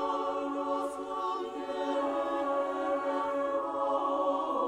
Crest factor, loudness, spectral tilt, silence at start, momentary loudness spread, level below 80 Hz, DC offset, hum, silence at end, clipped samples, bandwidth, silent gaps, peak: 14 dB; -32 LUFS; -4 dB/octave; 0 s; 5 LU; -70 dBFS; under 0.1%; none; 0 s; under 0.1%; 11.5 kHz; none; -18 dBFS